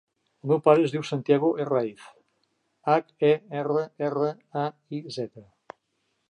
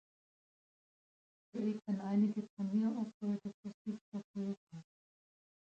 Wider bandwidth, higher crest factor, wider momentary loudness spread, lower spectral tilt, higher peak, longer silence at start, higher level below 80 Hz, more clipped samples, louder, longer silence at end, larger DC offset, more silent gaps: first, 10 kHz vs 7.6 kHz; first, 22 dB vs 16 dB; about the same, 14 LU vs 14 LU; second, -7.5 dB/octave vs -9 dB/octave; first, -4 dBFS vs -24 dBFS; second, 0.45 s vs 1.55 s; first, -78 dBFS vs -84 dBFS; neither; first, -25 LUFS vs -39 LUFS; about the same, 0.9 s vs 0.95 s; neither; second, none vs 2.50-2.57 s, 3.14-3.20 s, 3.54-3.63 s, 3.74-3.85 s, 4.01-4.12 s, 4.24-4.34 s, 4.57-4.67 s